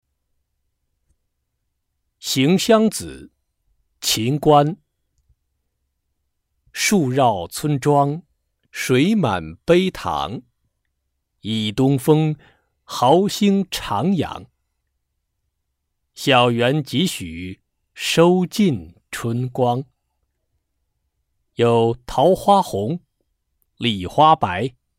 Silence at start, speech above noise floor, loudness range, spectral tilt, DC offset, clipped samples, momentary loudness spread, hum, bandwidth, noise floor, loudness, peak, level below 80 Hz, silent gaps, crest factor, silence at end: 2.25 s; 57 dB; 3 LU; -5 dB/octave; under 0.1%; under 0.1%; 16 LU; none; 16 kHz; -75 dBFS; -19 LUFS; -2 dBFS; -52 dBFS; none; 18 dB; 0.3 s